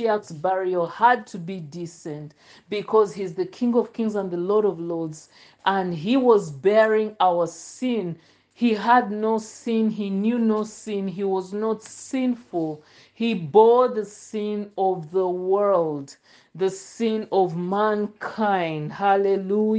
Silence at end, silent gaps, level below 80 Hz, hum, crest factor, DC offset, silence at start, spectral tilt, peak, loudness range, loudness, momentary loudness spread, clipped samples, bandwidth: 0 s; none; -72 dBFS; none; 18 dB; under 0.1%; 0 s; -6 dB/octave; -4 dBFS; 4 LU; -23 LUFS; 13 LU; under 0.1%; 9.6 kHz